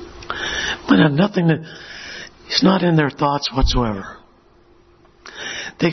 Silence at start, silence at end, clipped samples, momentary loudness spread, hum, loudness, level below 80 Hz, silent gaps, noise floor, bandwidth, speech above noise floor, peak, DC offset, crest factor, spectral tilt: 0 s; 0 s; under 0.1%; 18 LU; none; -18 LUFS; -32 dBFS; none; -51 dBFS; 6.4 kHz; 35 dB; 0 dBFS; under 0.1%; 20 dB; -5.5 dB/octave